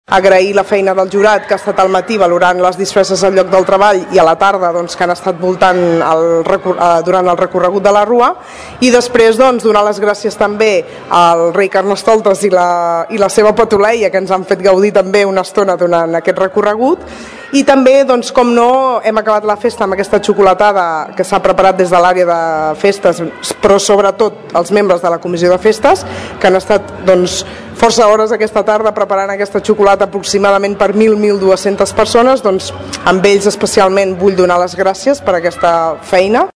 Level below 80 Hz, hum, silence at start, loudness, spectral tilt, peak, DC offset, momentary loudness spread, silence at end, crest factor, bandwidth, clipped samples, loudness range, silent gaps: -42 dBFS; none; 0.1 s; -10 LUFS; -4.5 dB/octave; 0 dBFS; 0.3%; 6 LU; 0.05 s; 10 dB; 11 kHz; 2%; 1 LU; none